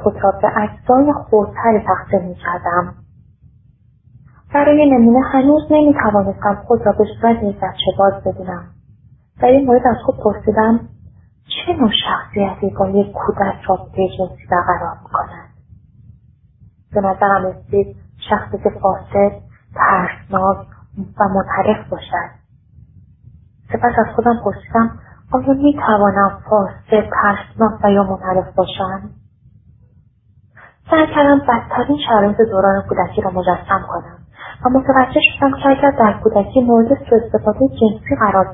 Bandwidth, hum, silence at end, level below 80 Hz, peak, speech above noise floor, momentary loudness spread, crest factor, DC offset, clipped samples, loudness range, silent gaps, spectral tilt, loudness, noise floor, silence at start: 3.9 kHz; none; 0 s; -40 dBFS; 0 dBFS; 37 dB; 10 LU; 16 dB; under 0.1%; under 0.1%; 7 LU; none; -11.5 dB/octave; -15 LUFS; -51 dBFS; 0 s